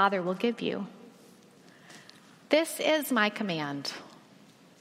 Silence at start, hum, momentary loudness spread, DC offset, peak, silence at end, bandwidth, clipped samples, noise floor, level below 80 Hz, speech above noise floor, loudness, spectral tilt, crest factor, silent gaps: 0 s; none; 24 LU; under 0.1%; -10 dBFS; 0.65 s; 16 kHz; under 0.1%; -56 dBFS; -82 dBFS; 28 dB; -29 LUFS; -4 dB/octave; 22 dB; none